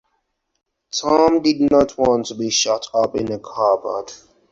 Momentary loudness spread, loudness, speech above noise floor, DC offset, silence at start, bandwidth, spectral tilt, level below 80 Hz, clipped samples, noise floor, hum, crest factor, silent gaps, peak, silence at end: 11 LU; -18 LUFS; 53 dB; under 0.1%; 0.95 s; 7.8 kHz; -3.5 dB/octave; -50 dBFS; under 0.1%; -71 dBFS; none; 18 dB; none; -2 dBFS; 0.35 s